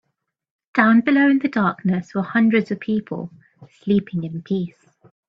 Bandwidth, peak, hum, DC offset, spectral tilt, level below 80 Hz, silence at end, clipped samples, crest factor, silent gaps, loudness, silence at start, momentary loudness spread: 7 kHz; 0 dBFS; none; under 0.1%; -8.5 dB/octave; -62 dBFS; 0.6 s; under 0.1%; 20 dB; none; -19 LUFS; 0.75 s; 16 LU